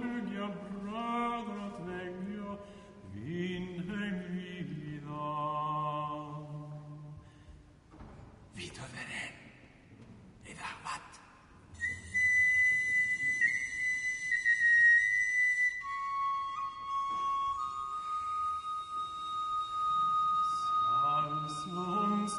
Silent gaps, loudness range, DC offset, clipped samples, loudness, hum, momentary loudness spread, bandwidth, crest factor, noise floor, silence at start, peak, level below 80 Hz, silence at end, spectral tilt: none; 18 LU; under 0.1%; under 0.1%; -31 LUFS; none; 18 LU; 10.5 kHz; 16 dB; -57 dBFS; 0 s; -18 dBFS; -64 dBFS; 0 s; -4 dB/octave